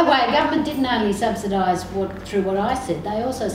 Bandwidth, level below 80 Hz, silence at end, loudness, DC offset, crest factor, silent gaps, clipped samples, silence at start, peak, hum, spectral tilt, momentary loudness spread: 16 kHz; -44 dBFS; 0 s; -21 LUFS; under 0.1%; 16 dB; none; under 0.1%; 0 s; -4 dBFS; none; -5 dB/octave; 7 LU